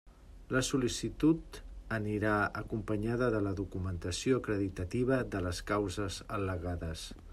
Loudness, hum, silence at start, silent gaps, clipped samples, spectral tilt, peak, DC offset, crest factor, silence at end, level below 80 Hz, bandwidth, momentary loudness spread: -34 LUFS; none; 0.05 s; none; under 0.1%; -5.5 dB/octave; -18 dBFS; under 0.1%; 16 dB; 0 s; -50 dBFS; 14 kHz; 8 LU